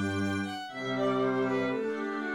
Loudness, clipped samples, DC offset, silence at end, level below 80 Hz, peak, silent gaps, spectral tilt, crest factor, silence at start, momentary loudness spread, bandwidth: -31 LUFS; under 0.1%; under 0.1%; 0 s; -72 dBFS; -16 dBFS; none; -6 dB/octave; 14 dB; 0 s; 6 LU; 16 kHz